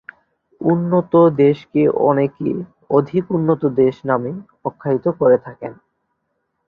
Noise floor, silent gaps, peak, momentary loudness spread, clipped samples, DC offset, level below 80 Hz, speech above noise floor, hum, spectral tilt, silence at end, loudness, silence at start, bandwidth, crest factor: -71 dBFS; none; -2 dBFS; 14 LU; under 0.1%; under 0.1%; -58 dBFS; 55 dB; none; -11 dB/octave; 0.95 s; -17 LUFS; 0.6 s; 5 kHz; 16 dB